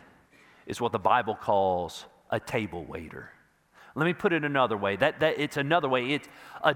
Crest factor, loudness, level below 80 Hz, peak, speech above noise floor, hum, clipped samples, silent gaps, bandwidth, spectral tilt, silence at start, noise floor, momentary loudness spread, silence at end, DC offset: 22 dB; -27 LUFS; -62 dBFS; -6 dBFS; 31 dB; none; under 0.1%; none; 17 kHz; -5.5 dB/octave; 0.65 s; -58 dBFS; 15 LU; 0 s; under 0.1%